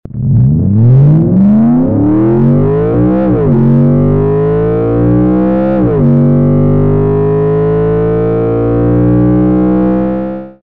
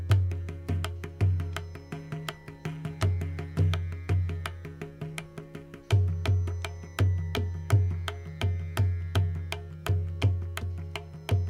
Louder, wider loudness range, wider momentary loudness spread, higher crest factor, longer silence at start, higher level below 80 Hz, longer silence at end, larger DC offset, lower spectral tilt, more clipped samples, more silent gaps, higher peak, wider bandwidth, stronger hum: first, -9 LUFS vs -31 LUFS; about the same, 2 LU vs 3 LU; second, 4 LU vs 13 LU; second, 6 dB vs 18 dB; about the same, 0.1 s vs 0 s; first, -26 dBFS vs -50 dBFS; first, 0.15 s vs 0 s; neither; first, -13 dB/octave vs -6.5 dB/octave; neither; neither; first, -2 dBFS vs -10 dBFS; second, 3.6 kHz vs 13.5 kHz; neither